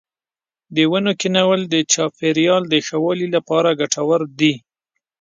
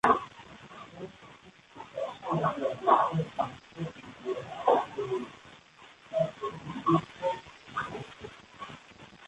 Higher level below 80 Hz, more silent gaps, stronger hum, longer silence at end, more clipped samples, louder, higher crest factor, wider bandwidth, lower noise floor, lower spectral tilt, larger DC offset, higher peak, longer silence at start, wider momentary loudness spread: about the same, -66 dBFS vs -64 dBFS; neither; neither; first, 0.65 s vs 0 s; neither; first, -17 LUFS vs -31 LUFS; second, 16 dB vs 24 dB; second, 9.6 kHz vs 11 kHz; first, under -90 dBFS vs -55 dBFS; second, -4 dB/octave vs -6.5 dB/octave; neither; first, -2 dBFS vs -8 dBFS; first, 0.7 s vs 0.05 s; second, 4 LU vs 22 LU